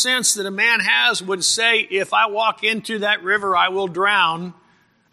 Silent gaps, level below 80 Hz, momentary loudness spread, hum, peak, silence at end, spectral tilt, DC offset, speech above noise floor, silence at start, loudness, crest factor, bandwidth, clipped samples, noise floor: none; -68 dBFS; 5 LU; none; -2 dBFS; 0.6 s; -1 dB/octave; under 0.1%; 39 dB; 0 s; -17 LUFS; 18 dB; 15 kHz; under 0.1%; -58 dBFS